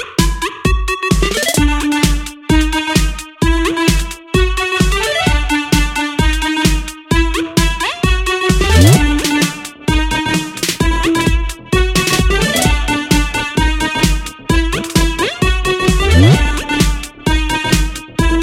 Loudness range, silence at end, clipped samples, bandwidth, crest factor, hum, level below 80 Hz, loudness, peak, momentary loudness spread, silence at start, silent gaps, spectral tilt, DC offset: 2 LU; 0 s; under 0.1%; 16.5 kHz; 14 dB; none; -18 dBFS; -14 LUFS; 0 dBFS; 6 LU; 0 s; none; -4.5 dB/octave; under 0.1%